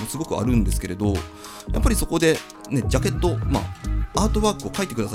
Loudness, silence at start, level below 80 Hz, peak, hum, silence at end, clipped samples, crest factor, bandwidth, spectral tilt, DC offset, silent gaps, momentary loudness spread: -23 LUFS; 0 s; -28 dBFS; -2 dBFS; none; 0 s; under 0.1%; 20 dB; 16.5 kHz; -5.5 dB/octave; under 0.1%; none; 8 LU